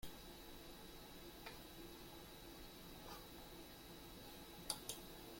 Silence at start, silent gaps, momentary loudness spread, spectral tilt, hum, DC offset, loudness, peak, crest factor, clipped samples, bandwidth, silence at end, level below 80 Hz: 0 s; none; 9 LU; -2.5 dB/octave; none; under 0.1%; -54 LUFS; -26 dBFS; 30 dB; under 0.1%; 16.5 kHz; 0 s; -64 dBFS